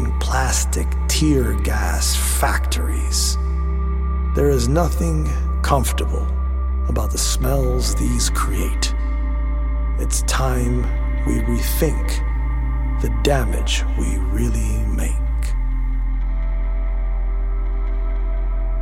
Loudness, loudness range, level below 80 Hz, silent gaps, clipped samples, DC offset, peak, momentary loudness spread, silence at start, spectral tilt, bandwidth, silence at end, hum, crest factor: -21 LUFS; 4 LU; -20 dBFS; none; under 0.1%; under 0.1%; -2 dBFS; 6 LU; 0 s; -4.5 dB/octave; 16.5 kHz; 0 s; none; 16 dB